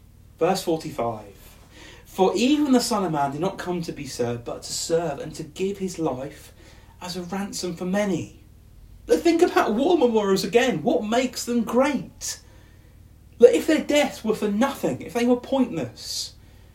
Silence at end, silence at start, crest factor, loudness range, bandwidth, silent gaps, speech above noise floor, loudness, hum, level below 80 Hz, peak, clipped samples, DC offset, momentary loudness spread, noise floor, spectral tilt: 0.45 s; 0.4 s; 22 dB; 8 LU; 16 kHz; none; 26 dB; -23 LUFS; none; -52 dBFS; 0 dBFS; under 0.1%; under 0.1%; 12 LU; -49 dBFS; -4.5 dB/octave